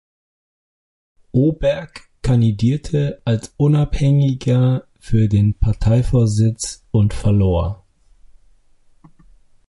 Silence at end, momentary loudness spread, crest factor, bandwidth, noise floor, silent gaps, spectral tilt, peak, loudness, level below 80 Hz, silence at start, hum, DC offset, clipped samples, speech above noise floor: 1.95 s; 7 LU; 14 dB; 11.5 kHz; -51 dBFS; none; -7.5 dB/octave; -4 dBFS; -18 LUFS; -30 dBFS; 1.35 s; none; under 0.1%; under 0.1%; 36 dB